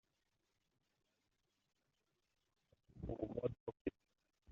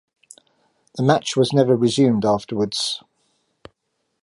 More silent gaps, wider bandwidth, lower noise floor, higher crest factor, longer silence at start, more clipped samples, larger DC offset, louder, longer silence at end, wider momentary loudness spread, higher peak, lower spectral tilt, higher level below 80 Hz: first, 3.60-3.67 s, 3.81-3.85 s vs none; second, 7.2 kHz vs 11.5 kHz; first, -86 dBFS vs -73 dBFS; first, 26 dB vs 20 dB; first, 2.95 s vs 0.95 s; neither; neither; second, -47 LUFS vs -19 LUFS; second, 0 s vs 1.25 s; about the same, 6 LU vs 8 LU; second, -26 dBFS vs -2 dBFS; first, -8.5 dB/octave vs -5.5 dB/octave; second, -66 dBFS vs -60 dBFS